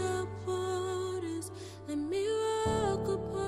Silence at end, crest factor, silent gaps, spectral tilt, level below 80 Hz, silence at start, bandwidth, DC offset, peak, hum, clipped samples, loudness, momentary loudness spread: 0 s; 16 dB; none; -5.5 dB/octave; -52 dBFS; 0 s; 14.5 kHz; under 0.1%; -18 dBFS; none; under 0.1%; -34 LUFS; 8 LU